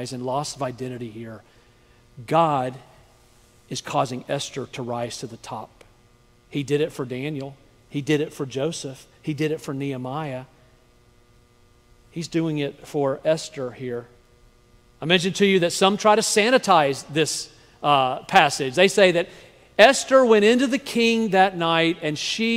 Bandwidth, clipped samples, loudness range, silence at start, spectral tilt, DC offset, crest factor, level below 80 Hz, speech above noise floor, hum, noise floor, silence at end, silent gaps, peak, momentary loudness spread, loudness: 16 kHz; under 0.1%; 12 LU; 0 s; -4 dB/octave; under 0.1%; 22 dB; -60 dBFS; 34 dB; none; -56 dBFS; 0 s; none; 0 dBFS; 18 LU; -21 LUFS